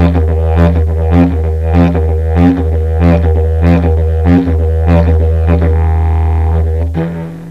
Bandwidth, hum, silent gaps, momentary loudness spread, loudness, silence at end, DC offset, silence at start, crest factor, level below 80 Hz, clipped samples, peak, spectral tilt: 4.7 kHz; none; none; 4 LU; -11 LUFS; 0 s; 0.9%; 0 s; 10 dB; -14 dBFS; under 0.1%; 0 dBFS; -10 dB/octave